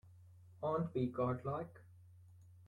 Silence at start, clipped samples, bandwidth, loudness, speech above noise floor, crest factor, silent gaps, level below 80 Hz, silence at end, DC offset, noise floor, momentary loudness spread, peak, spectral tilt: 0.05 s; under 0.1%; 10 kHz; -40 LUFS; 22 dB; 18 dB; none; -70 dBFS; 0 s; under 0.1%; -61 dBFS; 12 LU; -24 dBFS; -10 dB/octave